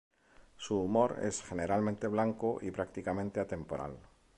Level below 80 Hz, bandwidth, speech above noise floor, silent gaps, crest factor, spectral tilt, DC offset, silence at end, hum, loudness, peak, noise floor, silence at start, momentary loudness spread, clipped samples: -58 dBFS; 11 kHz; 26 dB; none; 20 dB; -6 dB/octave; under 0.1%; 0.35 s; none; -35 LUFS; -16 dBFS; -60 dBFS; 0.6 s; 10 LU; under 0.1%